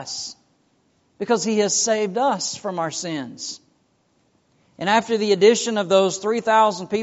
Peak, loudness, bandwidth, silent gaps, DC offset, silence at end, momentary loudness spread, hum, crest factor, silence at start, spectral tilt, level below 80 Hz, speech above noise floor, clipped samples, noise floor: -2 dBFS; -20 LUFS; 8.2 kHz; none; under 0.1%; 0 s; 15 LU; none; 18 dB; 0 s; -3 dB/octave; -70 dBFS; 44 dB; under 0.1%; -64 dBFS